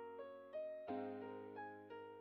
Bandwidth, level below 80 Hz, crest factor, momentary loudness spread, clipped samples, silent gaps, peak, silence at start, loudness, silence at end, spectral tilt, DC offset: 5.4 kHz; under -90 dBFS; 16 dB; 7 LU; under 0.1%; none; -34 dBFS; 0 s; -51 LUFS; 0 s; -5 dB/octave; under 0.1%